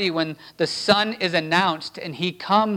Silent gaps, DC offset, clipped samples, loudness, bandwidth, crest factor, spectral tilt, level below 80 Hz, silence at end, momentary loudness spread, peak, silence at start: none; under 0.1%; under 0.1%; -22 LUFS; 17 kHz; 20 dB; -4.5 dB/octave; -64 dBFS; 0 s; 9 LU; -2 dBFS; 0 s